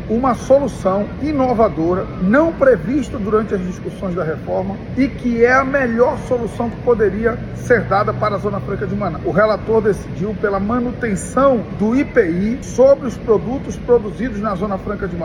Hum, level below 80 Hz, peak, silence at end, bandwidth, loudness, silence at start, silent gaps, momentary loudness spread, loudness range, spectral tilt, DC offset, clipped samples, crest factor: none; -36 dBFS; -2 dBFS; 0 s; 12 kHz; -17 LUFS; 0 s; none; 8 LU; 2 LU; -7 dB/octave; under 0.1%; under 0.1%; 16 dB